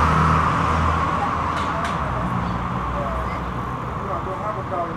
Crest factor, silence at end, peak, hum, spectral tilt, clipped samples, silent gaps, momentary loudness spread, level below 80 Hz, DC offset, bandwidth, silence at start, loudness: 16 dB; 0 s; -6 dBFS; none; -6.5 dB/octave; under 0.1%; none; 9 LU; -34 dBFS; under 0.1%; 12.5 kHz; 0 s; -22 LUFS